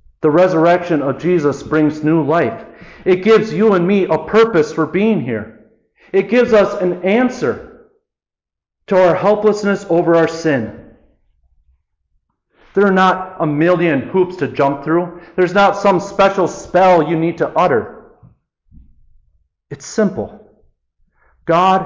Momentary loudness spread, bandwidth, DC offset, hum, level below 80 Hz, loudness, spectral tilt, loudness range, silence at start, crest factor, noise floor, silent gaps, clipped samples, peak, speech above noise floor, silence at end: 9 LU; 7.6 kHz; under 0.1%; none; -50 dBFS; -14 LUFS; -6.5 dB/octave; 5 LU; 0.2 s; 12 dB; -86 dBFS; none; under 0.1%; -4 dBFS; 73 dB; 0 s